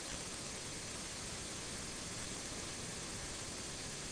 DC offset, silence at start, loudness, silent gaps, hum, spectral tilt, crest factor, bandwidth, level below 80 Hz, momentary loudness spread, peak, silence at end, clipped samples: under 0.1%; 0 s; -43 LUFS; none; none; -2 dB/octave; 16 dB; 10.5 kHz; -58 dBFS; 1 LU; -28 dBFS; 0 s; under 0.1%